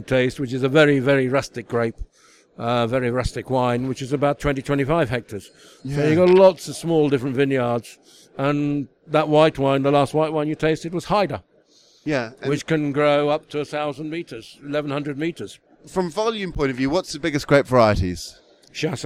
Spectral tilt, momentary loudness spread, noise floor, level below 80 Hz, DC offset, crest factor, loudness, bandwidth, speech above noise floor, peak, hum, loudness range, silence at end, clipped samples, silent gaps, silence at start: -6 dB/octave; 13 LU; -56 dBFS; -42 dBFS; under 0.1%; 20 dB; -21 LUFS; 15 kHz; 35 dB; -2 dBFS; none; 5 LU; 0 s; under 0.1%; none; 0 s